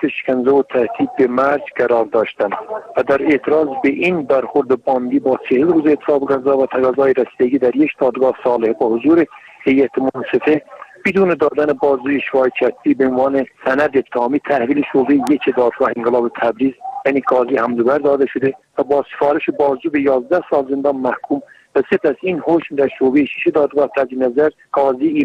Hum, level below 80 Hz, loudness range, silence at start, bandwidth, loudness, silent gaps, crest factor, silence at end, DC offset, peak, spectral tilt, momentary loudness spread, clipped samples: none; -56 dBFS; 2 LU; 0 s; 9.4 kHz; -16 LUFS; none; 12 dB; 0 s; under 0.1%; -4 dBFS; -7.5 dB/octave; 5 LU; under 0.1%